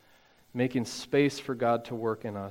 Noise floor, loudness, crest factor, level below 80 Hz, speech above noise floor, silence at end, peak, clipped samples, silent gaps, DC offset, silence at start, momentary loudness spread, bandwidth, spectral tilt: -61 dBFS; -30 LUFS; 18 dB; -68 dBFS; 32 dB; 0 s; -12 dBFS; under 0.1%; none; under 0.1%; 0.55 s; 7 LU; 16 kHz; -5.5 dB/octave